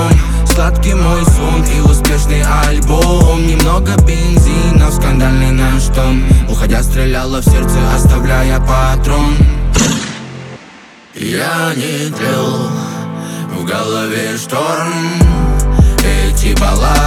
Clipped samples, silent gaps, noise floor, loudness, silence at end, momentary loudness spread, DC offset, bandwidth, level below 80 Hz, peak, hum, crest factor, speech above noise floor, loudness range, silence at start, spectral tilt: under 0.1%; none; -37 dBFS; -12 LUFS; 0 s; 8 LU; under 0.1%; 16 kHz; -12 dBFS; 0 dBFS; none; 10 dB; 27 dB; 6 LU; 0 s; -5.5 dB/octave